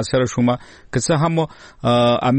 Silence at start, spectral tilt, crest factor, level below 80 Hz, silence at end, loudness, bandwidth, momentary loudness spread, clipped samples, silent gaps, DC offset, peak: 0 s; -5.5 dB/octave; 12 dB; -46 dBFS; 0 s; -19 LUFS; 8.8 kHz; 10 LU; under 0.1%; none; 0.1%; -6 dBFS